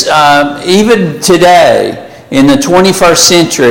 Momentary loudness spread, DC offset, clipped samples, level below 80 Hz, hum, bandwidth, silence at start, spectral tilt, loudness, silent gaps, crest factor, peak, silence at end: 7 LU; under 0.1%; 0.5%; -36 dBFS; none; over 20 kHz; 0 s; -3.5 dB/octave; -6 LUFS; none; 6 dB; 0 dBFS; 0 s